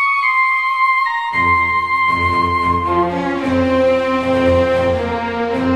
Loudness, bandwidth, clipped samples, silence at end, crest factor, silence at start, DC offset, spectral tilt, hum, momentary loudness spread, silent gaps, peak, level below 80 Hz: -15 LUFS; 12.5 kHz; under 0.1%; 0 s; 12 dB; 0 s; under 0.1%; -6.5 dB/octave; none; 5 LU; none; -4 dBFS; -38 dBFS